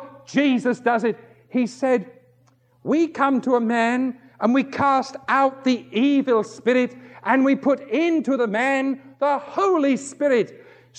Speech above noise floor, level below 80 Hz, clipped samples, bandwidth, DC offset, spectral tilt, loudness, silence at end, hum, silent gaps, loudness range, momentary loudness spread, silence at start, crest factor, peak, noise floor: 38 dB; -74 dBFS; under 0.1%; 9.2 kHz; under 0.1%; -5.5 dB/octave; -21 LUFS; 0.45 s; none; none; 2 LU; 6 LU; 0 s; 18 dB; -4 dBFS; -59 dBFS